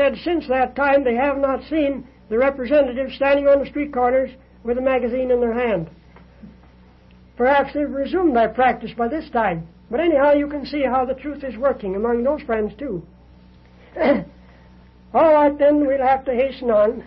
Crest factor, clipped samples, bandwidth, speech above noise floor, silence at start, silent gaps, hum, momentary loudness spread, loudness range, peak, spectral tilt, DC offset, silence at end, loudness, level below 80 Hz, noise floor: 14 dB; under 0.1%; 5.6 kHz; 30 dB; 0 s; none; none; 10 LU; 4 LU; -6 dBFS; -9 dB/octave; under 0.1%; 0.05 s; -19 LUFS; -46 dBFS; -48 dBFS